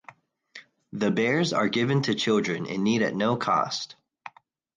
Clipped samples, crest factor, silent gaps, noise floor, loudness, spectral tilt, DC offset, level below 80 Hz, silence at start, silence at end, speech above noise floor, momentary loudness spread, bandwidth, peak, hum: under 0.1%; 16 dB; none; -53 dBFS; -25 LUFS; -5 dB/octave; under 0.1%; -68 dBFS; 0.55 s; 0.5 s; 28 dB; 19 LU; 9.8 kHz; -10 dBFS; none